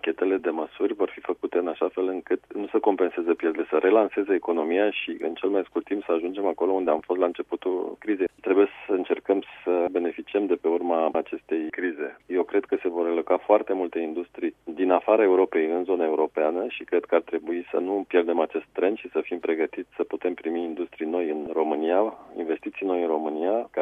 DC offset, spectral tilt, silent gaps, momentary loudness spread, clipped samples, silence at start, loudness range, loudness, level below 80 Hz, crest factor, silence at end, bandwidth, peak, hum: under 0.1%; -7 dB/octave; none; 8 LU; under 0.1%; 0.05 s; 3 LU; -26 LUFS; -70 dBFS; 20 dB; 0 s; 3.8 kHz; -6 dBFS; none